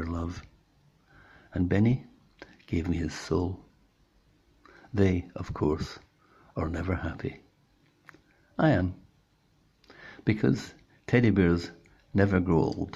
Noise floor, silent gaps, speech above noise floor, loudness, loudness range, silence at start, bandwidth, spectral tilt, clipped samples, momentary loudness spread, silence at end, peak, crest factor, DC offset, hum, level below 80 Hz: -66 dBFS; none; 40 dB; -28 LUFS; 6 LU; 0 s; 10 kHz; -8 dB/octave; under 0.1%; 18 LU; 0.05 s; -8 dBFS; 22 dB; under 0.1%; none; -52 dBFS